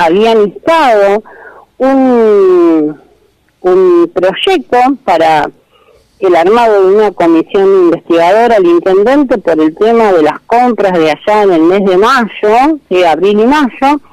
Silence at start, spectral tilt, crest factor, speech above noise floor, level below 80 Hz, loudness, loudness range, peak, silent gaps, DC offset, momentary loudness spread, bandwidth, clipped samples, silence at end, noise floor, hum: 0 s; -6 dB/octave; 6 dB; 43 dB; -44 dBFS; -8 LUFS; 2 LU; 0 dBFS; none; under 0.1%; 4 LU; 13.5 kHz; under 0.1%; 0.15 s; -50 dBFS; none